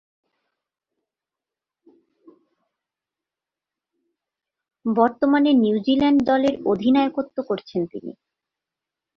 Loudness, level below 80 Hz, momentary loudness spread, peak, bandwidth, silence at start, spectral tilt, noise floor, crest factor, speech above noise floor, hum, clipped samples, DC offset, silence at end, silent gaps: -20 LUFS; -62 dBFS; 12 LU; -4 dBFS; 6.4 kHz; 4.85 s; -7 dB/octave; -88 dBFS; 20 dB; 69 dB; none; under 0.1%; under 0.1%; 1.05 s; none